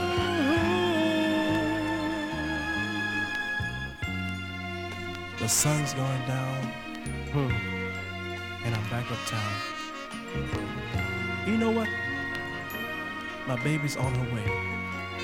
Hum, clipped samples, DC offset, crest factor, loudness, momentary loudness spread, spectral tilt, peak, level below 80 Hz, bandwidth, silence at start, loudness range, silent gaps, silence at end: none; under 0.1%; under 0.1%; 16 dB; -29 LUFS; 10 LU; -4.5 dB/octave; -14 dBFS; -48 dBFS; 17 kHz; 0 s; 4 LU; none; 0 s